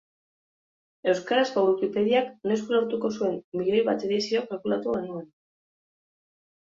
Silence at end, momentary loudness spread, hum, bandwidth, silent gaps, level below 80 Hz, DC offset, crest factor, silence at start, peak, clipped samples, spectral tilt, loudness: 1.4 s; 6 LU; none; 7.6 kHz; 3.44-3.52 s; -70 dBFS; under 0.1%; 18 dB; 1.05 s; -10 dBFS; under 0.1%; -5.5 dB/octave; -26 LUFS